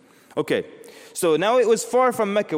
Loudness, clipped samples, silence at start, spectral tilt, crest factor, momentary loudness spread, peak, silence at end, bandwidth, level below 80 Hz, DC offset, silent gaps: -21 LUFS; under 0.1%; 0.35 s; -4 dB/octave; 14 dB; 13 LU; -8 dBFS; 0 s; 16.5 kHz; -70 dBFS; under 0.1%; none